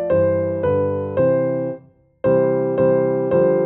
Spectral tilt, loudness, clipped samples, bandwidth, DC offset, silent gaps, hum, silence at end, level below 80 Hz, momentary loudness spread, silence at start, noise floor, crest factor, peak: -12.5 dB/octave; -19 LUFS; under 0.1%; 3.4 kHz; under 0.1%; none; none; 0 s; -54 dBFS; 7 LU; 0 s; -43 dBFS; 14 dB; -4 dBFS